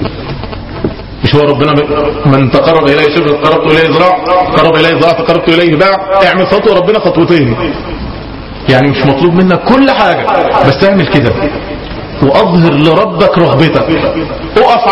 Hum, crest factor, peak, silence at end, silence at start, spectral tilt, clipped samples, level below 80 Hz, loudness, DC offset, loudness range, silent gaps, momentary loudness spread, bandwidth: none; 8 dB; 0 dBFS; 0 s; 0 s; -7.5 dB/octave; 1%; -30 dBFS; -8 LUFS; 0.3%; 2 LU; none; 12 LU; 10 kHz